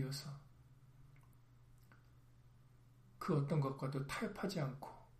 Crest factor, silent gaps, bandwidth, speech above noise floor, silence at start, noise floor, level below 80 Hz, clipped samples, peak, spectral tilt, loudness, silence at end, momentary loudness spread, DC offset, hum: 20 dB; none; 15 kHz; 25 dB; 0 s; -65 dBFS; -68 dBFS; under 0.1%; -24 dBFS; -6.5 dB/octave; -42 LUFS; 0 s; 23 LU; under 0.1%; none